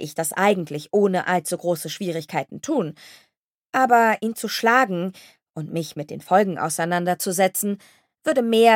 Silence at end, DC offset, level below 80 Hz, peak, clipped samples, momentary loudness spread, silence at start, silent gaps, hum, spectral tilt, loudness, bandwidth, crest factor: 0 s; under 0.1%; -76 dBFS; -2 dBFS; under 0.1%; 12 LU; 0 s; 3.37-3.62 s, 3.69-3.73 s, 5.50-5.54 s; none; -4 dB/octave; -22 LUFS; 17 kHz; 20 dB